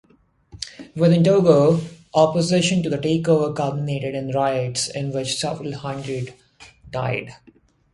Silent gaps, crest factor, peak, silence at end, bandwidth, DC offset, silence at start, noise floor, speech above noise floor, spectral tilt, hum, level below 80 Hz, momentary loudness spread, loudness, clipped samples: none; 20 dB; -2 dBFS; 0.6 s; 11.5 kHz; under 0.1%; 0.55 s; -54 dBFS; 35 dB; -5.5 dB/octave; none; -54 dBFS; 16 LU; -20 LUFS; under 0.1%